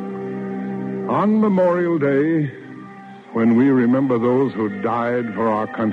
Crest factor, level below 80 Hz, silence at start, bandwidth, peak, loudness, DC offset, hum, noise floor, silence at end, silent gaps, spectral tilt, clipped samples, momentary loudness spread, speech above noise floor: 12 dB; -66 dBFS; 0 s; 5.6 kHz; -6 dBFS; -19 LUFS; under 0.1%; none; -38 dBFS; 0 s; none; -9.5 dB/octave; under 0.1%; 12 LU; 21 dB